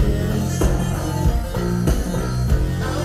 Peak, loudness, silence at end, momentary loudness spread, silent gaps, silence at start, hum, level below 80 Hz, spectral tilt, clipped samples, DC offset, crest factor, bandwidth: -6 dBFS; -21 LUFS; 0 s; 3 LU; none; 0 s; none; -24 dBFS; -6.5 dB/octave; under 0.1%; under 0.1%; 14 dB; 15.5 kHz